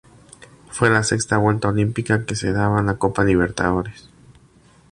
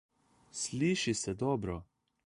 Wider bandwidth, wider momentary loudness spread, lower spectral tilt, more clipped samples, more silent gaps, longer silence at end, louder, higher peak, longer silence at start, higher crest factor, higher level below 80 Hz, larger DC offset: about the same, 11.5 kHz vs 11.5 kHz; second, 5 LU vs 12 LU; about the same, -5.5 dB/octave vs -4.5 dB/octave; neither; neither; first, 0.9 s vs 0.4 s; first, -19 LUFS vs -34 LUFS; first, -2 dBFS vs -18 dBFS; first, 0.7 s vs 0.55 s; about the same, 18 dB vs 16 dB; first, -40 dBFS vs -58 dBFS; neither